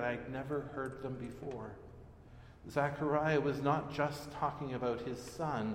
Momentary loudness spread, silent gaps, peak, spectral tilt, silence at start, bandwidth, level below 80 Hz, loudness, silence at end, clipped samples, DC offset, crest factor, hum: 21 LU; none; -18 dBFS; -6.5 dB/octave; 0 s; 16 kHz; -60 dBFS; -37 LUFS; 0 s; under 0.1%; under 0.1%; 20 dB; none